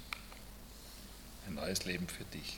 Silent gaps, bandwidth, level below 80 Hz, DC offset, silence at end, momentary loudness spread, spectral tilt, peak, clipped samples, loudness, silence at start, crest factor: none; 18 kHz; -56 dBFS; under 0.1%; 0 s; 15 LU; -3.5 dB/octave; -20 dBFS; under 0.1%; -43 LUFS; 0 s; 24 dB